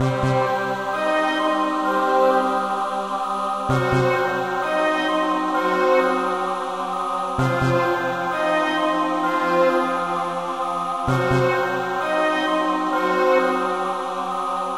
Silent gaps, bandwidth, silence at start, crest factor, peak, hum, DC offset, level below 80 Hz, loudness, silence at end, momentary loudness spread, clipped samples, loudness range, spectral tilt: none; 16 kHz; 0 s; 16 dB; -6 dBFS; none; 0.3%; -50 dBFS; -21 LUFS; 0 s; 6 LU; under 0.1%; 1 LU; -6 dB/octave